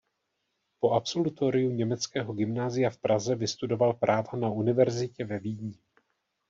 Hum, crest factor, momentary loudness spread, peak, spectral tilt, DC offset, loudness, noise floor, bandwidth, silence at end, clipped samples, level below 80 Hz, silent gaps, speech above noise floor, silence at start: none; 18 dB; 9 LU; -10 dBFS; -6 dB/octave; under 0.1%; -28 LUFS; -80 dBFS; 7.6 kHz; 0.75 s; under 0.1%; -68 dBFS; none; 52 dB; 0.8 s